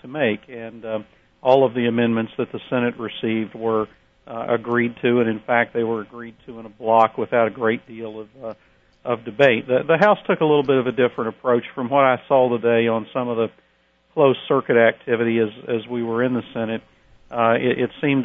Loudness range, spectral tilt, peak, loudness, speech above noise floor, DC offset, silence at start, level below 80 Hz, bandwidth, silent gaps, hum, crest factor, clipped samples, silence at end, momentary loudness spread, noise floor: 4 LU; -8 dB/octave; -2 dBFS; -20 LUFS; 41 dB; under 0.1%; 0.05 s; -62 dBFS; 6.8 kHz; none; none; 20 dB; under 0.1%; 0 s; 15 LU; -61 dBFS